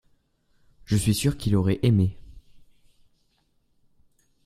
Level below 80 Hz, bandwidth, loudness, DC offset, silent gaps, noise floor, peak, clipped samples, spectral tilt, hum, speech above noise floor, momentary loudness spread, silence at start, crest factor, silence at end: -46 dBFS; 14.5 kHz; -24 LUFS; under 0.1%; none; -68 dBFS; -8 dBFS; under 0.1%; -6.5 dB/octave; none; 46 dB; 5 LU; 0.9 s; 20 dB; 1.85 s